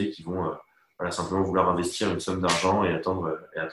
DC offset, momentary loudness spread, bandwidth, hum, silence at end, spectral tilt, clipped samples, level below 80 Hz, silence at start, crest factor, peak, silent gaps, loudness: under 0.1%; 9 LU; 12.5 kHz; none; 0 s; -4.5 dB/octave; under 0.1%; -48 dBFS; 0 s; 20 dB; -8 dBFS; none; -27 LUFS